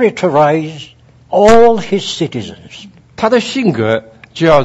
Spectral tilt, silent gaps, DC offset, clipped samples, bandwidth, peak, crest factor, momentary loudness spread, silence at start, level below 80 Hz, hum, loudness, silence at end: -5.5 dB/octave; none; under 0.1%; 0.6%; 10.5 kHz; 0 dBFS; 12 dB; 21 LU; 0 s; -38 dBFS; none; -12 LUFS; 0 s